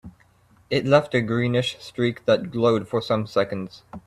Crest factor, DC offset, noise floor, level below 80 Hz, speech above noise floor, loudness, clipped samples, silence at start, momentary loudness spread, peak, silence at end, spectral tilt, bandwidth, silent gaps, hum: 20 dB; under 0.1%; -57 dBFS; -58 dBFS; 35 dB; -23 LUFS; under 0.1%; 0.05 s; 9 LU; -4 dBFS; 0.05 s; -6.5 dB/octave; 13 kHz; none; none